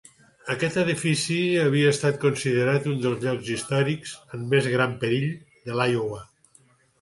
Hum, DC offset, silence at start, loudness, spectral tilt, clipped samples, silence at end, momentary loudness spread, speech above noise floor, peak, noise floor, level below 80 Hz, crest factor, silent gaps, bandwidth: none; under 0.1%; 0.45 s; -24 LUFS; -5.5 dB/octave; under 0.1%; 0.75 s; 11 LU; 36 dB; -6 dBFS; -59 dBFS; -62 dBFS; 18 dB; none; 11.5 kHz